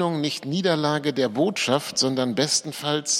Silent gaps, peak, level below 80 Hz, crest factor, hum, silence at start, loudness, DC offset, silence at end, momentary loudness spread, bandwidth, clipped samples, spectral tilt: none; -6 dBFS; -70 dBFS; 18 dB; none; 0 s; -23 LUFS; under 0.1%; 0 s; 4 LU; 16.5 kHz; under 0.1%; -3.5 dB/octave